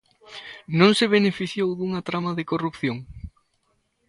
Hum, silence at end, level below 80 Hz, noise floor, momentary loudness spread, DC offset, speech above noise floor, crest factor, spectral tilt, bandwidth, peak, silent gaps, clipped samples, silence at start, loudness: none; 0.8 s; -52 dBFS; -70 dBFS; 23 LU; under 0.1%; 48 dB; 20 dB; -5.5 dB/octave; 11.5 kHz; -4 dBFS; none; under 0.1%; 0.3 s; -22 LUFS